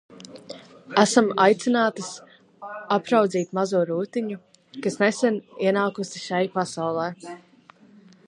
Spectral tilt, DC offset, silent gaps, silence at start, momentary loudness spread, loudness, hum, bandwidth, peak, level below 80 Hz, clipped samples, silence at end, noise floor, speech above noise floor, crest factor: -4.5 dB/octave; under 0.1%; none; 0.1 s; 22 LU; -23 LUFS; none; 11.5 kHz; -2 dBFS; -76 dBFS; under 0.1%; 0.9 s; -53 dBFS; 30 dB; 22 dB